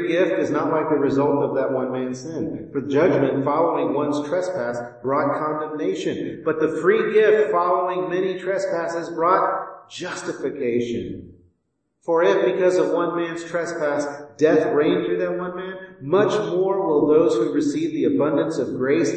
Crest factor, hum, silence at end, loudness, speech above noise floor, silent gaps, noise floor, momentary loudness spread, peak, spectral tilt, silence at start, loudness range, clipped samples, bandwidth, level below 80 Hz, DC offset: 18 dB; none; 0 s; -21 LUFS; 52 dB; none; -73 dBFS; 11 LU; -4 dBFS; -6 dB/octave; 0 s; 3 LU; under 0.1%; 8.8 kHz; -62 dBFS; under 0.1%